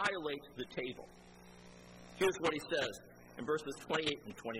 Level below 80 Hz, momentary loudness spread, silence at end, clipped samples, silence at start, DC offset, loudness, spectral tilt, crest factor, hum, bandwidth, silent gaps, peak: -68 dBFS; 21 LU; 0 s; under 0.1%; 0 s; under 0.1%; -38 LUFS; -3.5 dB/octave; 20 dB; 60 Hz at -60 dBFS; 15.5 kHz; none; -20 dBFS